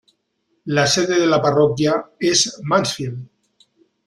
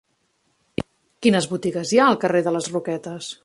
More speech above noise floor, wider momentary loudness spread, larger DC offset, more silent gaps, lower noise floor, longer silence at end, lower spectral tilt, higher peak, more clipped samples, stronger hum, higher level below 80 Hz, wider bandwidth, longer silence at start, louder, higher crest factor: about the same, 51 dB vs 48 dB; second, 12 LU vs 15 LU; neither; neither; about the same, -69 dBFS vs -68 dBFS; first, 0.85 s vs 0.1 s; about the same, -4 dB/octave vs -5 dB/octave; about the same, -2 dBFS vs -2 dBFS; neither; neither; about the same, -56 dBFS vs -58 dBFS; first, 13 kHz vs 11.5 kHz; second, 0.65 s vs 0.8 s; first, -17 LUFS vs -21 LUFS; about the same, 18 dB vs 20 dB